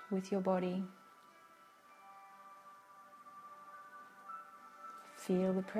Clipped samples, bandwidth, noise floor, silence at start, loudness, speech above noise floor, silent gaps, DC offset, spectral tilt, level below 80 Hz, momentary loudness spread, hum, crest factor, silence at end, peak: under 0.1%; 14.5 kHz; -62 dBFS; 0 s; -39 LUFS; 27 dB; none; under 0.1%; -7.5 dB/octave; -82 dBFS; 25 LU; none; 20 dB; 0 s; -22 dBFS